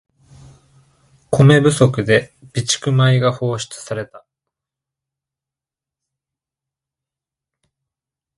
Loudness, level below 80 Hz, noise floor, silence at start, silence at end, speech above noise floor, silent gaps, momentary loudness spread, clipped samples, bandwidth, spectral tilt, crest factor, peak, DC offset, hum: -16 LUFS; -52 dBFS; -88 dBFS; 1.3 s; 4.2 s; 73 dB; none; 15 LU; under 0.1%; 11.5 kHz; -5.5 dB/octave; 20 dB; 0 dBFS; under 0.1%; none